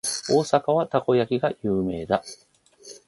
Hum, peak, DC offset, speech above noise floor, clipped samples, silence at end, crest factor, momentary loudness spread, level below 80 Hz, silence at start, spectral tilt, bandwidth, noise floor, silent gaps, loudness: none; -4 dBFS; under 0.1%; 25 dB; under 0.1%; 0.1 s; 20 dB; 6 LU; -56 dBFS; 0.05 s; -5 dB/octave; 12 kHz; -48 dBFS; none; -23 LUFS